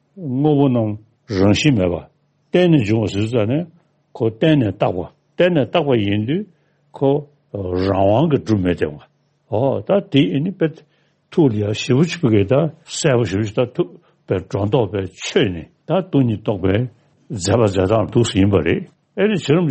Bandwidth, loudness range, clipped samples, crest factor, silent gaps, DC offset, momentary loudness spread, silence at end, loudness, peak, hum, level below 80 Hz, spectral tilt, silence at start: 8.8 kHz; 2 LU; under 0.1%; 16 dB; none; under 0.1%; 9 LU; 0 s; -18 LUFS; -2 dBFS; none; -52 dBFS; -6.5 dB/octave; 0.15 s